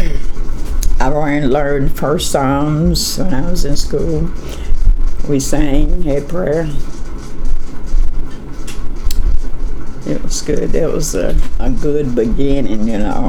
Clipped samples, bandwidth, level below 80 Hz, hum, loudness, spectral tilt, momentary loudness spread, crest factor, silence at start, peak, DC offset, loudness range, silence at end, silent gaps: under 0.1%; 13.5 kHz; -16 dBFS; none; -18 LUFS; -5.5 dB/octave; 13 LU; 10 dB; 0 s; 0 dBFS; under 0.1%; 7 LU; 0 s; none